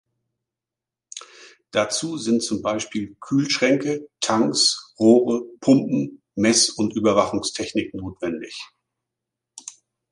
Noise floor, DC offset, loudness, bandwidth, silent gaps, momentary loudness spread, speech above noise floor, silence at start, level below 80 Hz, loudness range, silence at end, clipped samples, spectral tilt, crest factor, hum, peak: -88 dBFS; under 0.1%; -21 LUFS; 11.5 kHz; none; 21 LU; 67 dB; 1.15 s; -58 dBFS; 7 LU; 0.4 s; under 0.1%; -3.5 dB/octave; 20 dB; none; -2 dBFS